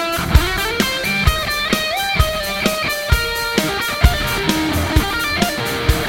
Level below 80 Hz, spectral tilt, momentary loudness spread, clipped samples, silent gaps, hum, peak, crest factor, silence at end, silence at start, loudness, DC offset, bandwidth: -24 dBFS; -4 dB/octave; 2 LU; under 0.1%; none; none; 0 dBFS; 18 dB; 0 s; 0 s; -17 LUFS; under 0.1%; 17.5 kHz